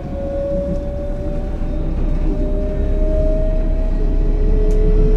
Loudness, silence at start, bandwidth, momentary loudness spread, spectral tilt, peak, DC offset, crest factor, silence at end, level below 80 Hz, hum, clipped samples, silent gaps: -21 LUFS; 0 s; 3.9 kHz; 6 LU; -9.5 dB/octave; -4 dBFS; under 0.1%; 12 dB; 0 s; -16 dBFS; none; under 0.1%; none